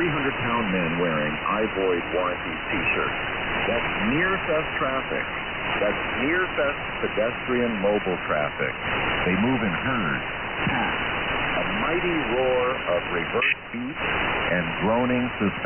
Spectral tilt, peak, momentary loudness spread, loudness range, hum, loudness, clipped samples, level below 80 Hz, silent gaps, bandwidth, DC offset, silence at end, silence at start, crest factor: -1.5 dB/octave; -12 dBFS; 4 LU; 1 LU; none; -24 LUFS; under 0.1%; -44 dBFS; none; 3.3 kHz; under 0.1%; 0 s; 0 s; 14 dB